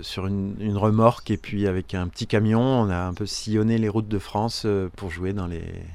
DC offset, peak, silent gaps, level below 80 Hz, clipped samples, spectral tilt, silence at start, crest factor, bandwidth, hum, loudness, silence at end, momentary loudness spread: under 0.1%; -2 dBFS; none; -44 dBFS; under 0.1%; -6.5 dB/octave; 0 s; 22 dB; 13 kHz; none; -24 LUFS; 0 s; 10 LU